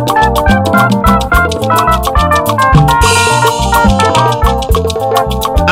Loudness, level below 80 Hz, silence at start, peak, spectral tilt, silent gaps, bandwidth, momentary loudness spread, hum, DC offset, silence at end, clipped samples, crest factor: -9 LUFS; -18 dBFS; 0 s; 0 dBFS; -5 dB/octave; none; 17 kHz; 5 LU; none; under 0.1%; 0 s; 1%; 8 dB